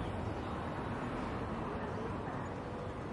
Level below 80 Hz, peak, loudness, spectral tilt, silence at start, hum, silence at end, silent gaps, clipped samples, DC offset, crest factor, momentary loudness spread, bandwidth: -52 dBFS; -28 dBFS; -40 LUFS; -7.5 dB/octave; 0 s; none; 0 s; none; under 0.1%; under 0.1%; 12 dB; 3 LU; 11.5 kHz